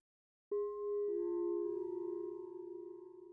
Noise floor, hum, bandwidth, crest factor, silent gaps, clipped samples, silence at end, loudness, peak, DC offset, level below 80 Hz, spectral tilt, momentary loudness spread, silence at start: under -90 dBFS; none; 2.1 kHz; 10 dB; none; under 0.1%; 0 s; -41 LUFS; -30 dBFS; under 0.1%; -82 dBFS; -10 dB/octave; 11 LU; 0.5 s